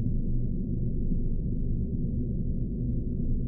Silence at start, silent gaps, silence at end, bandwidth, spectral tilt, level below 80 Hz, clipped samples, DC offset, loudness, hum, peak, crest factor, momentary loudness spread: 0 s; none; 0 s; 0.7 kHz; -10.5 dB/octave; -30 dBFS; under 0.1%; under 0.1%; -32 LUFS; none; -16 dBFS; 12 dB; 1 LU